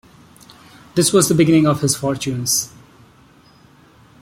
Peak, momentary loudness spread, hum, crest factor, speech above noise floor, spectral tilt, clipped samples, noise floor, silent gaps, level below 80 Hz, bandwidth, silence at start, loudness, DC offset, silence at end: 0 dBFS; 8 LU; none; 18 dB; 34 dB; -4.5 dB/octave; under 0.1%; -49 dBFS; none; -52 dBFS; 16.5 kHz; 0.95 s; -16 LUFS; under 0.1%; 1.55 s